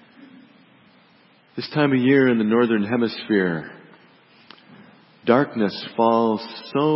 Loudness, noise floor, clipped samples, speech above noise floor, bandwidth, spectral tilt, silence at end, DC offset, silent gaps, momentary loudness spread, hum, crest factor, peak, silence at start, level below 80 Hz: -20 LUFS; -55 dBFS; under 0.1%; 36 dB; 5.8 kHz; -11 dB/octave; 0 s; under 0.1%; none; 12 LU; none; 20 dB; -2 dBFS; 0.2 s; -66 dBFS